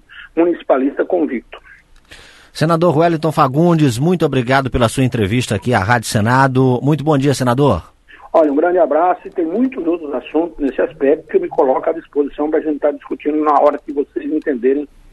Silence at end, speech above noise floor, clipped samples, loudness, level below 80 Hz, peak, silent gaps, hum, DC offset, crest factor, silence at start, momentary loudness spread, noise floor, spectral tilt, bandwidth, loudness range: 0.25 s; 27 dB; under 0.1%; -16 LUFS; -42 dBFS; 0 dBFS; none; none; under 0.1%; 16 dB; 0.1 s; 7 LU; -42 dBFS; -6.5 dB/octave; 12.5 kHz; 3 LU